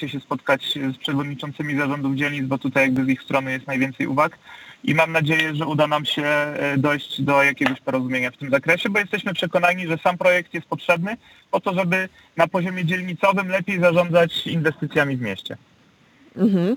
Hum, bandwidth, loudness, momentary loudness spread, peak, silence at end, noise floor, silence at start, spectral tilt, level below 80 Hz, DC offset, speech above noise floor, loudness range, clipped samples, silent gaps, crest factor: none; 19 kHz; -21 LUFS; 9 LU; -2 dBFS; 0 s; -55 dBFS; 0 s; -6 dB/octave; -64 dBFS; under 0.1%; 34 dB; 2 LU; under 0.1%; none; 20 dB